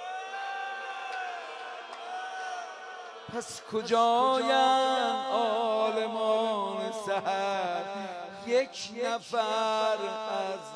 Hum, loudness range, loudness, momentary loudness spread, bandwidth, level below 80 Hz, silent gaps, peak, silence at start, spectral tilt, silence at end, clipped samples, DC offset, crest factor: none; 11 LU; -30 LUFS; 15 LU; 11 kHz; -80 dBFS; none; -12 dBFS; 0 s; -3 dB/octave; 0 s; under 0.1%; under 0.1%; 18 dB